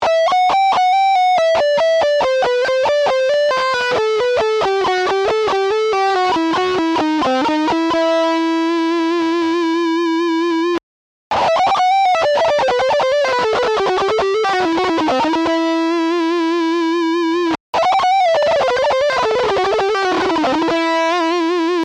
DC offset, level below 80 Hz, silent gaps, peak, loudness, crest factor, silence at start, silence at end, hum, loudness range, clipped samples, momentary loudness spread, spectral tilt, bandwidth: under 0.1%; -52 dBFS; 10.83-11.31 s, 17.60-17.73 s; -10 dBFS; -15 LUFS; 6 dB; 0 s; 0 s; none; 2 LU; under 0.1%; 3 LU; -3.5 dB/octave; 10 kHz